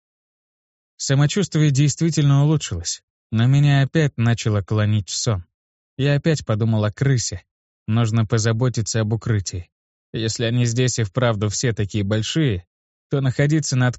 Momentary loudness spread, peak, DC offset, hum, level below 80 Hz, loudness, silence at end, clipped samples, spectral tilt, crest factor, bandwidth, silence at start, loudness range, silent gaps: 9 LU; -4 dBFS; under 0.1%; none; -48 dBFS; -20 LUFS; 0 s; under 0.1%; -5.5 dB/octave; 16 dB; 8.2 kHz; 1 s; 3 LU; 3.03-3.30 s, 5.54-5.97 s, 7.51-7.86 s, 9.72-10.13 s, 12.67-13.10 s